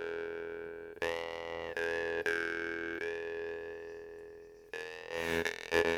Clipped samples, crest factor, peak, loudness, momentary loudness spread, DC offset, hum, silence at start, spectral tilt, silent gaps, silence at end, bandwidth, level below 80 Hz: under 0.1%; 26 dB; -12 dBFS; -37 LUFS; 13 LU; under 0.1%; none; 0 s; -3.5 dB/octave; none; 0 s; 17 kHz; -64 dBFS